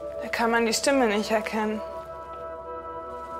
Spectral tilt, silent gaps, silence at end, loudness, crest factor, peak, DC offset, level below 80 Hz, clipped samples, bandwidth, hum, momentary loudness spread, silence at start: -3 dB/octave; none; 0 s; -26 LUFS; 18 dB; -10 dBFS; under 0.1%; -54 dBFS; under 0.1%; 16 kHz; none; 15 LU; 0 s